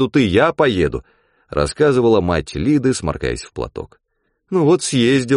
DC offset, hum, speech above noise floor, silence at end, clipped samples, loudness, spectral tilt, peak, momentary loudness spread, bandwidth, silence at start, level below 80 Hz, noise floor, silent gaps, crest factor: under 0.1%; none; 52 dB; 0 s; under 0.1%; -17 LUFS; -5.5 dB/octave; -2 dBFS; 13 LU; 10.5 kHz; 0 s; -36 dBFS; -68 dBFS; none; 16 dB